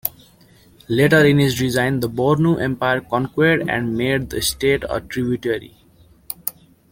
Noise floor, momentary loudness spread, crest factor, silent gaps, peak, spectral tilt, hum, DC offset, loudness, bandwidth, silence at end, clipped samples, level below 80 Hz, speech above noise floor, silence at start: -51 dBFS; 13 LU; 20 dB; none; 0 dBFS; -5.5 dB/octave; none; under 0.1%; -19 LUFS; 17 kHz; 0.4 s; under 0.1%; -46 dBFS; 33 dB; 0.05 s